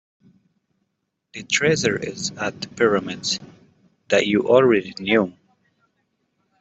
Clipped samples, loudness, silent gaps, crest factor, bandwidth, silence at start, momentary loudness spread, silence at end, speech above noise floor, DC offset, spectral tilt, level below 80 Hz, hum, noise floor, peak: under 0.1%; -20 LUFS; none; 20 dB; 8.2 kHz; 1.35 s; 12 LU; 1.3 s; 56 dB; under 0.1%; -4 dB/octave; -62 dBFS; none; -76 dBFS; -4 dBFS